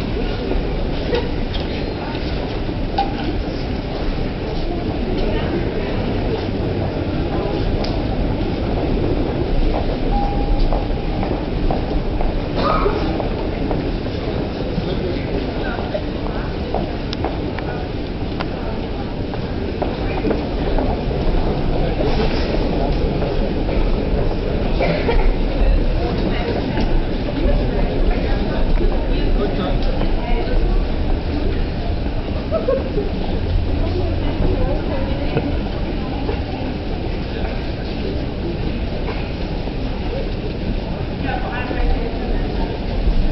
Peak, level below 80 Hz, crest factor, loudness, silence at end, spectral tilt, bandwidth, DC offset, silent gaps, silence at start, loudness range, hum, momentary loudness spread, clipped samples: -4 dBFS; -22 dBFS; 14 dB; -22 LUFS; 0 s; -8.5 dB/octave; 6 kHz; under 0.1%; none; 0 s; 4 LU; none; 4 LU; under 0.1%